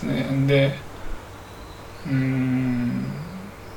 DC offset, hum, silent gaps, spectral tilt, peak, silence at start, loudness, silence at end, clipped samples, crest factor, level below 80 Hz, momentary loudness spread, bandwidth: under 0.1%; none; none; -7.5 dB/octave; -6 dBFS; 0 s; -23 LUFS; 0 s; under 0.1%; 18 dB; -42 dBFS; 20 LU; 18.5 kHz